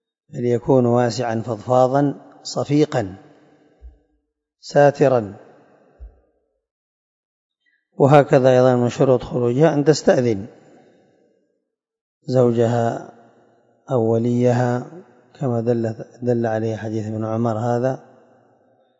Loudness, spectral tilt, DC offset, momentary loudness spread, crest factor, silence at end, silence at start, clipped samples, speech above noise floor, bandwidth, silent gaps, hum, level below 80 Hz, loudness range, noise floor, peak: -18 LUFS; -7 dB/octave; under 0.1%; 13 LU; 20 dB; 1 s; 0.35 s; under 0.1%; 58 dB; 7.8 kHz; 6.71-7.50 s, 12.01-12.21 s; none; -54 dBFS; 7 LU; -75 dBFS; 0 dBFS